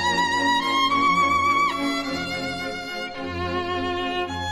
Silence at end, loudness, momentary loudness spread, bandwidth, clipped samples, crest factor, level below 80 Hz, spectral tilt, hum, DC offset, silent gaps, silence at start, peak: 0 s; -23 LUFS; 10 LU; 13 kHz; under 0.1%; 14 dB; -50 dBFS; -3.5 dB/octave; none; under 0.1%; none; 0 s; -10 dBFS